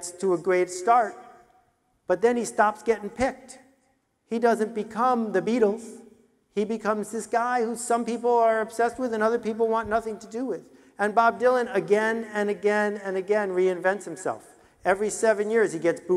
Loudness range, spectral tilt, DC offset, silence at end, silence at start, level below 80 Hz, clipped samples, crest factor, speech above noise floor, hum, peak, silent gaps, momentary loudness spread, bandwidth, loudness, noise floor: 2 LU; -4.5 dB/octave; under 0.1%; 0 s; 0 s; -62 dBFS; under 0.1%; 18 dB; 45 dB; none; -6 dBFS; none; 10 LU; 13.5 kHz; -25 LUFS; -69 dBFS